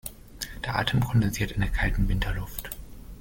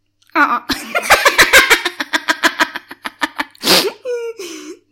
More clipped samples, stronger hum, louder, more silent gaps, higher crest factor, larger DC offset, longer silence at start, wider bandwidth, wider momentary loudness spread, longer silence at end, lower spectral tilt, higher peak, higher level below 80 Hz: neither; neither; second, -28 LUFS vs -13 LUFS; neither; about the same, 20 dB vs 16 dB; neither; second, 0.05 s vs 0.35 s; about the same, 17 kHz vs 17 kHz; second, 15 LU vs 19 LU; second, 0 s vs 0.2 s; first, -5 dB/octave vs -1 dB/octave; second, -8 dBFS vs 0 dBFS; first, -32 dBFS vs -44 dBFS